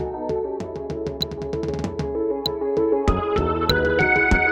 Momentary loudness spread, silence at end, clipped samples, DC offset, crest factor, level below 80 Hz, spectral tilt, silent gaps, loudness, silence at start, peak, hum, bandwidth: 11 LU; 0 s; under 0.1%; under 0.1%; 20 dB; -32 dBFS; -6 dB/octave; none; -22 LUFS; 0 s; -2 dBFS; none; 16 kHz